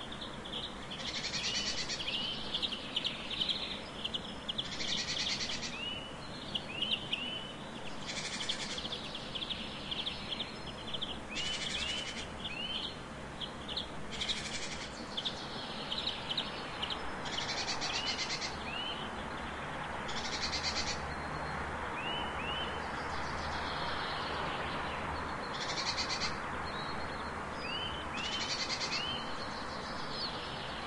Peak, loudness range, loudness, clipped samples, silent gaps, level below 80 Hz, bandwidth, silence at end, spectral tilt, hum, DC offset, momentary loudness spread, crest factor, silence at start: -20 dBFS; 3 LU; -37 LUFS; under 0.1%; none; -54 dBFS; 11.5 kHz; 0 s; -2.5 dB/octave; none; under 0.1%; 7 LU; 18 dB; 0 s